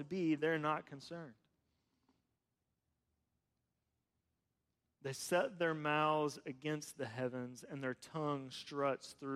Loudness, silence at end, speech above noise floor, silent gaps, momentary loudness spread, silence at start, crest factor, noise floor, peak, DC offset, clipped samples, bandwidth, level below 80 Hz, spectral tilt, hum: -39 LUFS; 0 s; 48 dB; none; 14 LU; 0 s; 20 dB; -88 dBFS; -22 dBFS; under 0.1%; under 0.1%; 15 kHz; -84 dBFS; -5 dB/octave; none